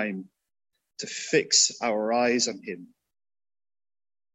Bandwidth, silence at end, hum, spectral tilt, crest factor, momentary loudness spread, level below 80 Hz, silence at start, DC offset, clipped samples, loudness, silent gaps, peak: 10 kHz; 1.5 s; none; -1.5 dB/octave; 22 dB; 19 LU; -80 dBFS; 0 s; under 0.1%; under 0.1%; -24 LUFS; none; -8 dBFS